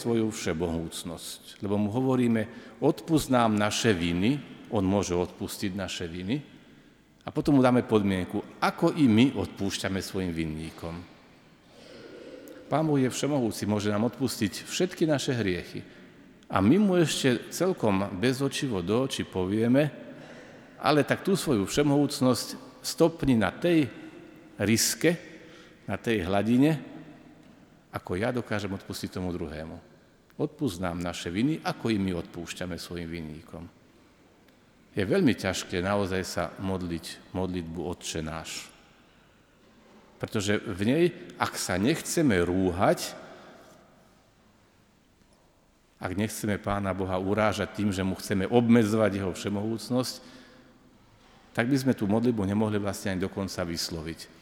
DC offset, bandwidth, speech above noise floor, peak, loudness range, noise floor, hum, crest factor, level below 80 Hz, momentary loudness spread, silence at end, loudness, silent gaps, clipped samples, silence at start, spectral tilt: under 0.1%; 18.5 kHz; 35 dB; -6 dBFS; 8 LU; -63 dBFS; none; 22 dB; -56 dBFS; 15 LU; 0.15 s; -28 LUFS; none; under 0.1%; 0 s; -5.5 dB/octave